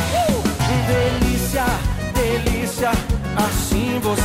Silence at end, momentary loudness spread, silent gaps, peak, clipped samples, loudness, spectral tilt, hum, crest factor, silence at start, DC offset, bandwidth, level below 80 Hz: 0 s; 4 LU; none; -8 dBFS; under 0.1%; -20 LUFS; -5 dB/octave; none; 10 dB; 0 s; under 0.1%; 16.5 kHz; -26 dBFS